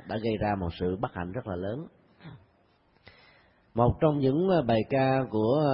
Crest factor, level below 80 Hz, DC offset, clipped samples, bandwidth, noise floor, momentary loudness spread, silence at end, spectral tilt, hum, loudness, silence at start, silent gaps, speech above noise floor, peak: 20 dB; -50 dBFS; under 0.1%; under 0.1%; 5.6 kHz; -65 dBFS; 11 LU; 0 s; -11.5 dB/octave; none; -28 LUFS; 0.05 s; none; 39 dB; -10 dBFS